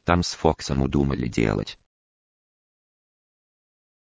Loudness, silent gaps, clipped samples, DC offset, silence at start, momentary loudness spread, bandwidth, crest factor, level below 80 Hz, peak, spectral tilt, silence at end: -23 LUFS; none; under 0.1%; under 0.1%; 0.05 s; 4 LU; 8 kHz; 24 dB; -38 dBFS; -2 dBFS; -6 dB/octave; 2.25 s